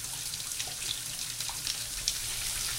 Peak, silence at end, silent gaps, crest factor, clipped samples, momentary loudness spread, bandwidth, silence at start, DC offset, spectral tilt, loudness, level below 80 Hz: -6 dBFS; 0 s; none; 30 dB; under 0.1%; 3 LU; 17 kHz; 0 s; under 0.1%; 0.5 dB/octave; -32 LUFS; -52 dBFS